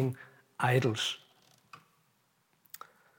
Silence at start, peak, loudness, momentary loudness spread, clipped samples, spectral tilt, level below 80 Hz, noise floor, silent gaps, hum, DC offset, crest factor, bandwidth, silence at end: 0 s; -14 dBFS; -31 LUFS; 22 LU; under 0.1%; -5 dB/octave; -82 dBFS; -73 dBFS; none; none; under 0.1%; 22 dB; 17 kHz; 2 s